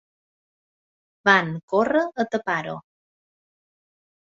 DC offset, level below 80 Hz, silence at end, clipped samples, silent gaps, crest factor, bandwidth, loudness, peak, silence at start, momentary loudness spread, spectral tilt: under 0.1%; -68 dBFS; 1.45 s; under 0.1%; 1.63-1.68 s; 24 dB; 7.8 kHz; -22 LUFS; -2 dBFS; 1.25 s; 11 LU; -5.5 dB/octave